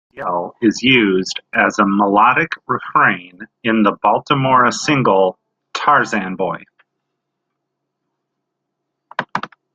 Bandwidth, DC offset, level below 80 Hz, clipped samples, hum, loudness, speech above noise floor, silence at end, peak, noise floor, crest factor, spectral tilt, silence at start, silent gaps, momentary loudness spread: 9.2 kHz; under 0.1%; -58 dBFS; under 0.1%; none; -15 LUFS; 61 dB; 0.3 s; 0 dBFS; -76 dBFS; 16 dB; -5 dB/octave; 0.15 s; none; 12 LU